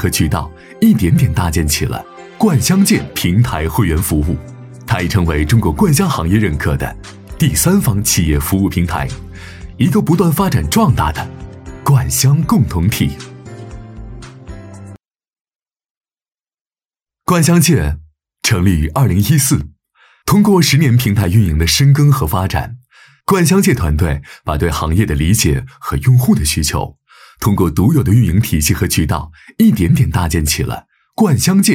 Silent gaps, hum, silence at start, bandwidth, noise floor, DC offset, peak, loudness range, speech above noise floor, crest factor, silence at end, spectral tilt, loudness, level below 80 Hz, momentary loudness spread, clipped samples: 15.41-15.45 s, 15.90-16.01 s, 16.61-16.65 s; none; 0 s; 17 kHz; under -90 dBFS; under 0.1%; -2 dBFS; 4 LU; over 77 dB; 12 dB; 0 s; -5.5 dB/octave; -14 LUFS; -28 dBFS; 19 LU; under 0.1%